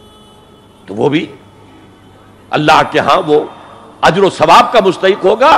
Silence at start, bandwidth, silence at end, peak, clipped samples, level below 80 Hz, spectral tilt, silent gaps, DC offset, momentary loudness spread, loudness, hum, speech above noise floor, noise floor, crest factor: 0.9 s; 15.5 kHz; 0 s; 0 dBFS; 0.3%; -46 dBFS; -5 dB/octave; none; under 0.1%; 12 LU; -10 LUFS; none; 32 dB; -41 dBFS; 12 dB